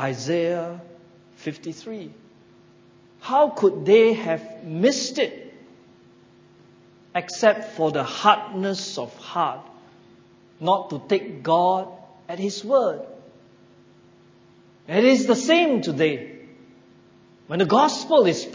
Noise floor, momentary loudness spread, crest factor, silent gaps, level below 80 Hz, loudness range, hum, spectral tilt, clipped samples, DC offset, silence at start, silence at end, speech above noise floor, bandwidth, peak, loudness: -53 dBFS; 18 LU; 22 dB; none; -72 dBFS; 6 LU; none; -4.5 dB/octave; under 0.1%; under 0.1%; 0 s; 0 s; 32 dB; 7.8 kHz; -2 dBFS; -21 LUFS